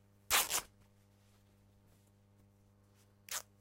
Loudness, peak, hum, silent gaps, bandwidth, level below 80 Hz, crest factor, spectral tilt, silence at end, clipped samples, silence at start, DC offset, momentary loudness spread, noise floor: -35 LUFS; -16 dBFS; 50 Hz at -70 dBFS; none; 16 kHz; -68 dBFS; 28 dB; 1 dB/octave; 0.2 s; under 0.1%; 0.3 s; under 0.1%; 28 LU; -67 dBFS